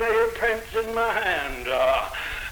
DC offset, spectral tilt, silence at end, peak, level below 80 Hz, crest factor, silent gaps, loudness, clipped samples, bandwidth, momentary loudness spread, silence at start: under 0.1%; -3 dB/octave; 0 s; -12 dBFS; -44 dBFS; 14 dB; none; -24 LUFS; under 0.1%; over 20 kHz; 5 LU; 0 s